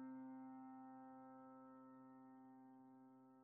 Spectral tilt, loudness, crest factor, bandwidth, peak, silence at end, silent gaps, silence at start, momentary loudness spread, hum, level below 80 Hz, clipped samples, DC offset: -4 dB/octave; -61 LUFS; 12 dB; 2.7 kHz; -48 dBFS; 0 s; none; 0 s; 9 LU; none; under -90 dBFS; under 0.1%; under 0.1%